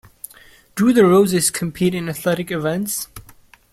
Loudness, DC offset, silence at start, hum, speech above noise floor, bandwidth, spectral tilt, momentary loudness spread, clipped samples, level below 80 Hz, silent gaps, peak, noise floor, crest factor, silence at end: -18 LUFS; under 0.1%; 0.75 s; none; 31 dB; 16 kHz; -5 dB/octave; 21 LU; under 0.1%; -52 dBFS; none; -2 dBFS; -48 dBFS; 16 dB; 0.5 s